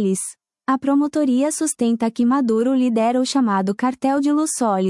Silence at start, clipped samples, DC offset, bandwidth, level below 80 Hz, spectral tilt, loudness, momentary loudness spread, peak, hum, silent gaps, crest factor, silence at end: 0 s; under 0.1%; under 0.1%; 12 kHz; -68 dBFS; -5 dB/octave; -19 LUFS; 4 LU; -8 dBFS; none; none; 10 dB; 0 s